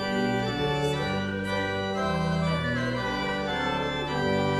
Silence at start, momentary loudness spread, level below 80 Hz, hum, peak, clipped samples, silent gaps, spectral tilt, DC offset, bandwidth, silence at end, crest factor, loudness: 0 s; 2 LU; -48 dBFS; none; -14 dBFS; under 0.1%; none; -6 dB/octave; under 0.1%; 13 kHz; 0 s; 14 dB; -28 LUFS